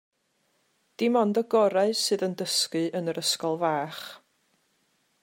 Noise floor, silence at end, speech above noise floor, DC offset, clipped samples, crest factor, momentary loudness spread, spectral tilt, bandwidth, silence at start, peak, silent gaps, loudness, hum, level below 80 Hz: -72 dBFS; 1.05 s; 46 dB; under 0.1%; under 0.1%; 16 dB; 7 LU; -3.5 dB/octave; 16 kHz; 1 s; -10 dBFS; none; -26 LUFS; none; -82 dBFS